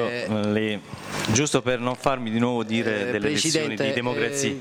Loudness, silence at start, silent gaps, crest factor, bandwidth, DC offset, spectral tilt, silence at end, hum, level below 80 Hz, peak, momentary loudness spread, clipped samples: -24 LUFS; 0 s; none; 18 dB; 20 kHz; under 0.1%; -4 dB/octave; 0 s; none; -54 dBFS; -6 dBFS; 4 LU; under 0.1%